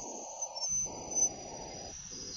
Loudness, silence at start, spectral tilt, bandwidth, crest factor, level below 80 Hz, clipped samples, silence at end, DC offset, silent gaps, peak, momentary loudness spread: -34 LUFS; 0 s; -1 dB/octave; 16 kHz; 18 dB; -60 dBFS; under 0.1%; 0 s; under 0.1%; none; -20 dBFS; 13 LU